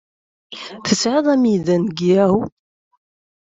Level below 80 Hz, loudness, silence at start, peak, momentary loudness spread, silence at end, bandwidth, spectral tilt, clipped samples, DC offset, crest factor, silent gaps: -58 dBFS; -17 LUFS; 0.5 s; -2 dBFS; 17 LU; 0.95 s; 8 kHz; -5.5 dB/octave; under 0.1%; under 0.1%; 16 dB; none